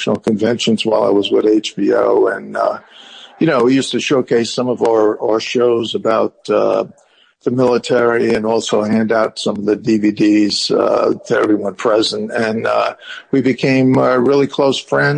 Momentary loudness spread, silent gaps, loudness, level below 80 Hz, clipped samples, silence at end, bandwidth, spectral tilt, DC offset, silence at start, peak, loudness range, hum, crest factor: 6 LU; none; -15 LUFS; -58 dBFS; under 0.1%; 0 s; 10 kHz; -5 dB/octave; under 0.1%; 0 s; -2 dBFS; 1 LU; none; 12 dB